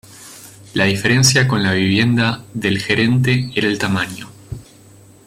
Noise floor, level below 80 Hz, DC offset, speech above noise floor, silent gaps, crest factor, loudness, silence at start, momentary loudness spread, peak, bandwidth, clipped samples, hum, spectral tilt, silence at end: -45 dBFS; -48 dBFS; under 0.1%; 29 dB; none; 16 dB; -16 LUFS; 0.1 s; 22 LU; -2 dBFS; 16 kHz; under 0.1%; none; -4.5 dB/octave; 0.65 s